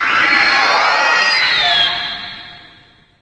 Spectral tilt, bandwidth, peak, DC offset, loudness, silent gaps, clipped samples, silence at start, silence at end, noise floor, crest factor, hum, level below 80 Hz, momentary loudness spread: -0.5 dB/octave; 9.8 kHz; 0 dBFS; under 0.1%; -12 LUFS; none; under 0.1%; 0 s; 0.65 s; -47 dBFS; 14 dB; none; -52 dBFS; 14 LU